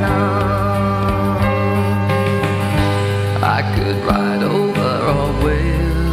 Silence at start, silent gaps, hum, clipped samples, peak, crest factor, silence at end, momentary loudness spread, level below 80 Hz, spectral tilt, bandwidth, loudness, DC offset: 0 s; none; none; under 0.1%; -4 dBFS; 12 dB; 0 s; 1 LU; -26 dBFS; -7 dB/octave; 14.5 kHz; -17 LUFS; under 0.1%